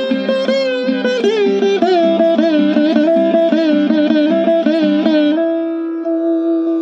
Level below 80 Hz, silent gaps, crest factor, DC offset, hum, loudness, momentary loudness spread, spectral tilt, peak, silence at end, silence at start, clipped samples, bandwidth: -64 dBFS; none; 12 dB; under 0.1%; none; -14 LUFS; 4 LU; -6.5 dB/octave; -2 dBFS; 0 s; 0 s; under 0.1%; 7.8 kHz